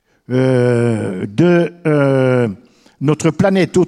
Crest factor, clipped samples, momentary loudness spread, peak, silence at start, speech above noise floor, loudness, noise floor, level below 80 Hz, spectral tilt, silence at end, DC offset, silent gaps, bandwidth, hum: 14 dB; under 0.1%; 8 LU; 0 dBFS; 0.3 s; 22 dB; -15 LUFS; -35 dBFS; -52 dBFS; -7.5 dB/octave; 0 s; under 0.1%; none; 11.5 kHz; none